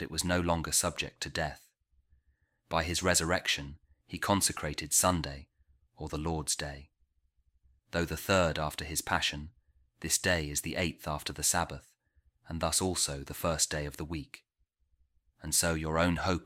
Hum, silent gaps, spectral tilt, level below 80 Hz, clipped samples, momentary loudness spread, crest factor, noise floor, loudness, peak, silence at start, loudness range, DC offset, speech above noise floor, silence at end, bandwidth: none; none; -3 dB/octave; -50 dBFS; under 0.1%; 14 LU; 22 dB; -75 dBFS; -31 LUFS; -12 dBFS; 0 s; 4 LU; under 0.1%; 43 dB; 0 s; 16.5 kHz